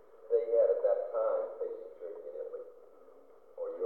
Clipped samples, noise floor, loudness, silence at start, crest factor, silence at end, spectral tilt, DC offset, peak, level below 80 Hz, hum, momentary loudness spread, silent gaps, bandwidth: under 0.1%; -58 dBFS; -33 LUFS; 0.15 s; 16 dB; 0 s; -6.5 dB/octave; under 0.1%; -18 dBFS; -86 dBFS; 60 Hz at -85 dBFS; 17 LU; none; 3.8 kHz